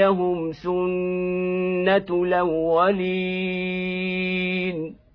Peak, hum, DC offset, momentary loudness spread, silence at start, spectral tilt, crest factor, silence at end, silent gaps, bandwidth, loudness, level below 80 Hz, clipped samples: -6 dBFS; none; under 0.1%; 6 LU; 0 s; -9 dB/octave; 16 dB; 0.2 s; none; 5.4 kHz; -23 LUFS; -54 dBFS; under 0.1%